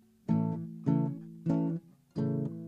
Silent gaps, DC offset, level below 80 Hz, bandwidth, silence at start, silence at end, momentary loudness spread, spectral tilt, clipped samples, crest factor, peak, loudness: none; under 0.1%; -70 dBFS; 5.2 kHz; 0.3 s; 0 s; 7 LU; -11 dB/octave; under 0.1%; 18 dB; -16 dBFS; -33 LUFS